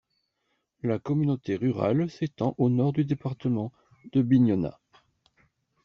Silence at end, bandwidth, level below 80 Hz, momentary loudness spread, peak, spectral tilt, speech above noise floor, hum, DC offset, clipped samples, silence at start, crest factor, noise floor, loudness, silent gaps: 1.15 s; 6.8 kHz; -62 dBFS; 9 LU; -10 dBFS; -9 dB/octave; 51 dB; none; under 0.1%; under 0.1%; 0.85 s; 18 dB; -77 dBFS; -27 LUFS; none